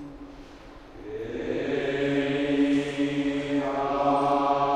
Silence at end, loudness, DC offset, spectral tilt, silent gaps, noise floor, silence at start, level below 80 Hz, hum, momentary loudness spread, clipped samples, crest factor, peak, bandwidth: 0 s; -26 LUFS; under 0.1%; -6.5 dB/octave; none; -46 dBFS; 0 s; -52 dBFS; none; 21 LU; under 0.1%; 16 dB; -10 dBFS; 9.4 kHz